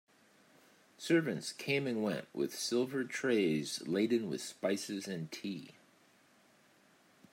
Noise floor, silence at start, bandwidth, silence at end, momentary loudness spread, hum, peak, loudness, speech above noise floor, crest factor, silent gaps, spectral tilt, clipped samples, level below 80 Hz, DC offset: -67 dBFS; 1 s; 16 kHz; 1.6 s; 10 LU; none; -18 dBFS; -35 LUFS; 32 dB; 20 dB; none; -4.5 dB/octave; under 0.1%; -84 dBFS; under 0.1%